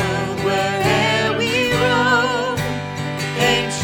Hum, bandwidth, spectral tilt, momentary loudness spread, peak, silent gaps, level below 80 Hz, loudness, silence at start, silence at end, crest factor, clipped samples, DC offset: none; over 20 kHz; -4 dB/octave; 8 LU; -2 dBFS; none; -44 dBFS; -18 LUFS; 0 s; 0 s; 16 dB; under 0.1%; under 0.1%